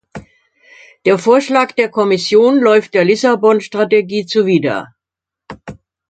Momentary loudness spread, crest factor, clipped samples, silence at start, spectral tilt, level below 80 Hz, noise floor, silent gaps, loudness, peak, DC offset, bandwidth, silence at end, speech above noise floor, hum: 9 LU; 14 dB; under 0.1%; 0.15 s; -5.5 dB/octave; -56 dBFS; -85 dBFS; none; -13 LUFS; 0 dBFS; under 0.1%; 9 kHz; 0.4 s; 73 dB; none